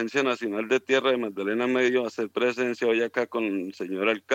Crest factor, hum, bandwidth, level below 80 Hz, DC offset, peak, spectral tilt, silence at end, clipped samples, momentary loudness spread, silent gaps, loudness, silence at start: 16 dB; none; 8.8 kHz; -82 dBFS; under 0.1%; -8 dBFS; -4.5 dB/octave; 0 s; under 0.1%; 6 LU; none; -26 LUFS; 0 s